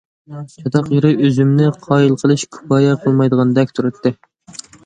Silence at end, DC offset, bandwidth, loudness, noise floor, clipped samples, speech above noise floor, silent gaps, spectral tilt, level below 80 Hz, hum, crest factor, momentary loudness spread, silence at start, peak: 0.7 s; under 0.1%; 9.4 kHz; -15 LUFS; -37 dBFS; under 0.1%; 23 dB; none; -7.5 dB/octave; -56 dBFS; none; 14 dB; 20 LU; 0.3 s; 0 dBFS